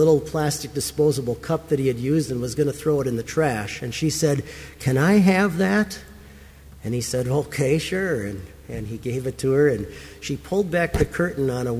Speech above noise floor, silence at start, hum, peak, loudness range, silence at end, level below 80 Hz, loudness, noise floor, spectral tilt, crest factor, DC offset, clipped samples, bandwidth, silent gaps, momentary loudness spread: 22 dB; 0 s; none; -6 dBFS; 4 LU; 0 s; -42 dBFS; -23 LUFS; -44 dBFS; -5.5 dB/octave; 16 dB; under 0.1%; under 0.1%; 16 kHz; none; 12 LU